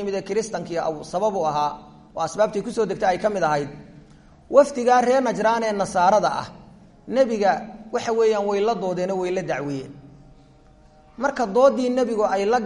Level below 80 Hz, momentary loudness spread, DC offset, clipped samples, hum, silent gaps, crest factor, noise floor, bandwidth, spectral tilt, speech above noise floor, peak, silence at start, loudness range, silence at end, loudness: -54 dBFS; 10 LU; under 0.1%; under 0.1%; none; none; 20 dB; -51 dBFS; 11 kHz; -5 dB/octave; 30 dB; -2 dBFS; 0 s; 4 LU; 0 s; -22 LUFS